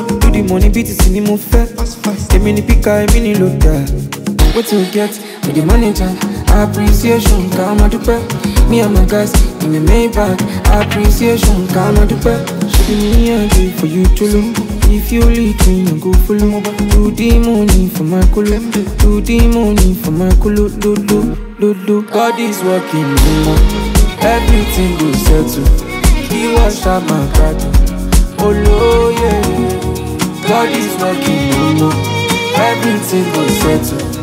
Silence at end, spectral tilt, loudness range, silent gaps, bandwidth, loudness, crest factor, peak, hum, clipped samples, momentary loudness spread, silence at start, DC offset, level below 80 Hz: 0 s; -5.5 dB/octave; 1 LU; none; 16.5 kHz; -12 LUFS; 10 dB; 0 dBFS; none; under 0.1%; 4 LU; 0 s; under 0.1%; -14 dBFS